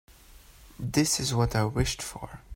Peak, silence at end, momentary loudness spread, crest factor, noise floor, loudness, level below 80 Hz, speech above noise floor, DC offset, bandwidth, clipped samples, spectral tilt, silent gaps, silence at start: -10 dBFS; 0 s; 13 LU; 20 dB; -53 dBFS; -28 LUFS; -44 dBFS; 25 dB; under 0.1%; 16.5 kHz; under 0.1%; -4.5 dB/octave; none; 0.1 s